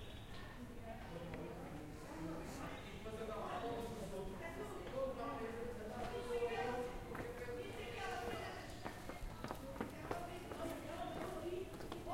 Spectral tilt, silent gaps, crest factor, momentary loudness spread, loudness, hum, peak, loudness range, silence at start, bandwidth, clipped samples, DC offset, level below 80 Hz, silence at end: -5.5 dB/octave; none; 22 dB; 7 LU; -47 LUFS; none; -24 dBFS; 3 LU; 0 s; 16 kHz; under 0.1%; under 0.1%; -58 dBFS; 0 s